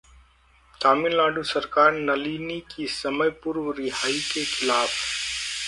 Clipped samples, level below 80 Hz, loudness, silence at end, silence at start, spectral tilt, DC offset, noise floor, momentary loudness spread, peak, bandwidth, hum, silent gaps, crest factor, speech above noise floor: under 0.1%; -56 dBFS; -24 LUFS; 0 s; 0.8 s; -2.5 dB/octave; under 0.1%; -58 dBFS; 10 LU; -4 dBFS; 11.5 kHz; none; none; 20 dB; 34 dB